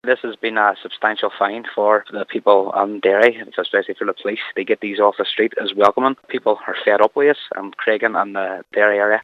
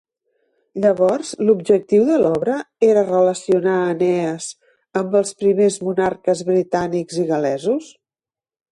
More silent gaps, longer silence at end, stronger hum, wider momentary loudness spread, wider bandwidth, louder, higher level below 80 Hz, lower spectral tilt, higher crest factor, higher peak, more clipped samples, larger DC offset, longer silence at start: neither; second, 0 s vs 0.9 s; neither; about the same, 8 LU vs 8 LU; second, 7 kHz vs 11.5 kHz; about the same, -18 LUFS vs -18 LUFS; second, -70 dBFS vs -60 dBFS; about the same, -5 dB/octave vs -6 dB/octave; about the same, 18 dB vs 14 dB; first, 0 dBFS vs -4 dBFS; neither; neither; second, 0.05 s vs 0.75 s